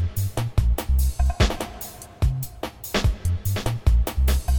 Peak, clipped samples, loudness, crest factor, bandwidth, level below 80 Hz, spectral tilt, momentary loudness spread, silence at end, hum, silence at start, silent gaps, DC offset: -6 dBFS; under 0.1%; -24 LUFS; 16 dB; 19 kHz; -24 dBFS; -5.5 dB/octave; 10 LU; 0 s; none; 0 s; none; under 0.1%